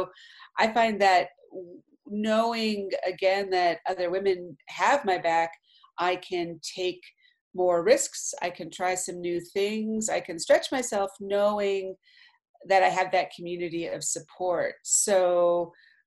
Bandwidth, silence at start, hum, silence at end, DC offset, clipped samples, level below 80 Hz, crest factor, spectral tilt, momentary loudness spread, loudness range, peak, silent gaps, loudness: 13 kHz; 0 s; none; 0.35 s; under 0.1%; under 0.1%; -70 dBFS; 20 dB; -2.5 dB/octave; 12 LU; 2 LU; -8 dBFS; 7.41-7.51 s, 12.49-12.54 s; -26 LUFS